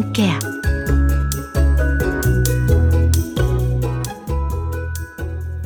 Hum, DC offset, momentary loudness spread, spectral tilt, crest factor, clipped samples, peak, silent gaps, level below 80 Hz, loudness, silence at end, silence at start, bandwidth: none; under 0.1%; 10 LU; -6 dB/octave; 14 dB; under 0.1%; -4 dBFS; none; -22 dBFS; -19 LUFS; 0 s; 0 s; over 20 kHz